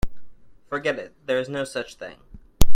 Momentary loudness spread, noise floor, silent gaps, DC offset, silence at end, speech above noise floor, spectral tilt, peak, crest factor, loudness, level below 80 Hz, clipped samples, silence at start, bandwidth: 14 LU; -38 dBFS; none; under 0.1%; 0 s; 10 dB; -4.5 dB/octave; 0 dBFS; 18 dB; -29 LUFS; -32 dBFS; under 0.1%; 0.05 s; 16.5 kHz